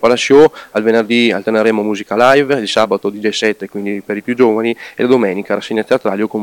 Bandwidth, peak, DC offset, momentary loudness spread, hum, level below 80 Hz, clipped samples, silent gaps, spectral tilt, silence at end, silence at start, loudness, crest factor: 18 kHz; 0 dBFS; under 0.1%; 10 LU; none; -56 dBFS; under 0.1%; none; -4.5 dB/octave; 0 s; 0 s; -13 LUFS; 14 dB